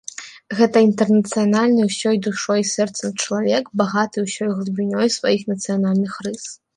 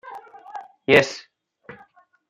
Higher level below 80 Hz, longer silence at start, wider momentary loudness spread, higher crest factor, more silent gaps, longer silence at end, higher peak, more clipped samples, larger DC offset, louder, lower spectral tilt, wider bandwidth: about the same, -66 dBFS vs -62 dBFS; first, 0.2 s vs 0.05 s; second, 9 LU vs 24 LU; second, 16 dB vs 24 dB; neither; second, 0.2 s vs 0.55 s; about the same, -4 dBFS vs -2 dBFS; neither; neither; about the same, -19 LUFS vs -19 LUFS; about the same, -5 dB/octave vs -4.5 dB/octave; second, 11 kHz vs 14 kHz